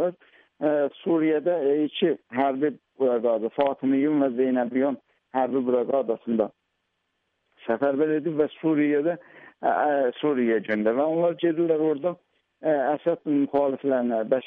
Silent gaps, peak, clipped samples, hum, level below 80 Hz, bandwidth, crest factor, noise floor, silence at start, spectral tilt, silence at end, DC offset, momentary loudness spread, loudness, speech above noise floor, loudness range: none; -10 dBFS; under 0.1%; none; -72 dBFS; 3.9 kHz; 14 dB; -76 dBFS; 0 s; -5 dB/octave; 0 s; under 0.1%; 6 LU; -24 LUFS; 53 dB; 3 LU